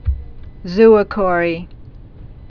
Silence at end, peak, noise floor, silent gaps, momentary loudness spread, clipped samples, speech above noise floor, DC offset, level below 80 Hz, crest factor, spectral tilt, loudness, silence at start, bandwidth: 0.1 s; 0 dBFS; -36 dBFS; none; 17 LU; under 0.1%; 23 dB; under 0.1%; -30 dBFS; 16 dB; -8.5 dB/octave; -14 LUFS; 0.05 s; 5.4 kHz